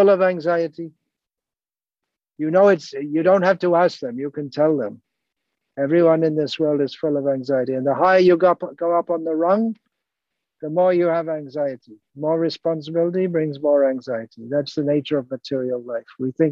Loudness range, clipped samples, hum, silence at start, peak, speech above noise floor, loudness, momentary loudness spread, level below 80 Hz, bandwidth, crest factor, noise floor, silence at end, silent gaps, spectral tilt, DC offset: 4 LU; under 0.1%; none; 0 s; -6 dBFS; over 71 dB; -20 LUFS; 12 LU; -70 dBFS; 7.4 kHz; 16 dB; under -90 dBFS; 0 s; none; -7.5 dB/octave; under 0.1%